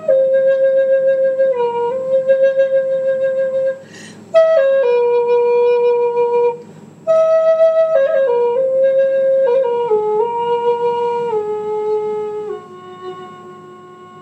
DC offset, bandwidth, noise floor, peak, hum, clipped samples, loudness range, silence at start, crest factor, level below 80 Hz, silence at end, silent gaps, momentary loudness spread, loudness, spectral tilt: under 0.1%; 8.2 kHz; -37 dBFS; -2 dBFS; none; under 0.1%; 5 LU; 0 s; 14 dB; -80 dBFS; 0 s; none; 14 LU; -15 LUFS; -5 dB/octave